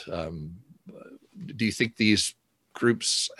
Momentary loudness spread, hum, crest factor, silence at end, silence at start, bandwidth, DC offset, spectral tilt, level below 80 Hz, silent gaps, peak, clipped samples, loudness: 21 LU; none; 22 dB; 0.05 s; 0 s; 12.5 kHz; under 0.1%; -3.5 dB/octave; -54 dBFS; none; -8 dBFS; under 0.1%; -26 LUFS